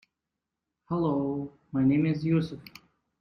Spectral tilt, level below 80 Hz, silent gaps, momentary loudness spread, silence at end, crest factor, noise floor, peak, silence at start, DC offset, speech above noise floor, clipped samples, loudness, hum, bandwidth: -9.5 dB/octave; -60 dBFS; none; 12 LU; 0.6 s; 16 dB; -87 dBFS; -14 dBFS; 0.9 s; under 0.1%; 60 dB; under 0.1%; -28 LUFS; none; 6.4 kHz